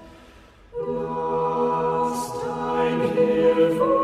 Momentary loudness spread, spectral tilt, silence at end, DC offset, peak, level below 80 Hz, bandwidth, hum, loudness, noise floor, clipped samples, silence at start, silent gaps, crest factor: 10 LU; -6 dB/octave; 0 s; under 0.1%; -8 dBFS; -52 dBFS; 14.5 kHz; none; -23 LUFS; -49 dBFS; under 0.1%; 0 s; none; 14 dB